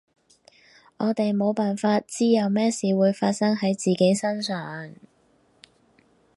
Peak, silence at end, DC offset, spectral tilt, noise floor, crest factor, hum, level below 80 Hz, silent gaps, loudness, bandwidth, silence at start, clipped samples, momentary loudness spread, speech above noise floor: -8 dBFS; 1.45 s; under 0.1%; -5.5 dB/octave; -62 dBFS; 18 dB; none; -72 dBFS; none; -23 LUFS; 11.5 kHz; 1 s; under 0.1%; 8 LU; 40 dB